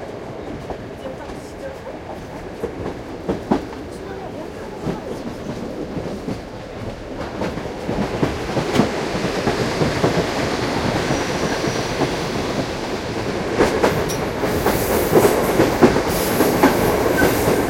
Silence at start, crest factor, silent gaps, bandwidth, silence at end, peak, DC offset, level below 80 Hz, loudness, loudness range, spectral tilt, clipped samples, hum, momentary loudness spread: 0 s; 20 dB; none; 16.5 kHz; 0 s; 0 dBFS; under 0.1%; -38 dBFS; -21 LUFS; 11 LU; -5 dB/octave; under 0.1%; none; 16 LU